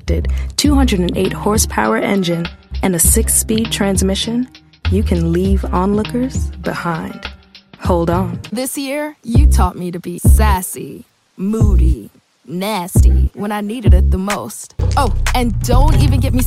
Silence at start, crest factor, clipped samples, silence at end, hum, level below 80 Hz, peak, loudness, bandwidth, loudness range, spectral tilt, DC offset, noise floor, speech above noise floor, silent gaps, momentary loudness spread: 0.05 s; 14 dB; under 0.1%; 0 s; none; -18 dBFS; 0 dBFS; -16 LUFS; 15.5 kHz; 4 LU; -5 dB/octave; under 0.1%; -41 dBFS; 27 dB; none; 12 LU